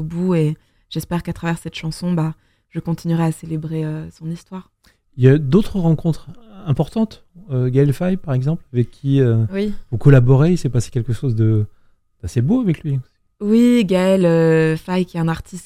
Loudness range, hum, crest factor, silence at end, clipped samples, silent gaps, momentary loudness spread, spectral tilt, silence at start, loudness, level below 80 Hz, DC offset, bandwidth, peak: 7 LU; none; 18 dB; 0.05 s; under 0.1%; none; 15 LU; -8 dB/octave; 0 s; -18 LUFS; -38 dBFS; under 0.1%; 14.5 kHz; 0 dBFS